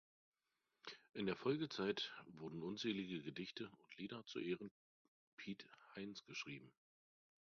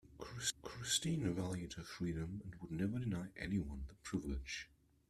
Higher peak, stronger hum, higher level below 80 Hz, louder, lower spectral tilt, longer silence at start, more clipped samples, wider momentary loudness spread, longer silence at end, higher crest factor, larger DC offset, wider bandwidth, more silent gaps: second, -28 dBFS vs -22 dBFS; neither; second, -84 dBFS vs -56 dBFS; second, -48 LUFS vs -42 LUFS; about the same, -4 dB/octave vs -4 dB/octave; first, 0.85 s vs 0.05 s; neither; first, 15 LU vs 11 LU; first, 0.85 s vs 0.45 s; about the same, 20 dB vs 20 dB; neither; second, 7 kHz vs 14 kHz; first, 4.71-5.37 s vs none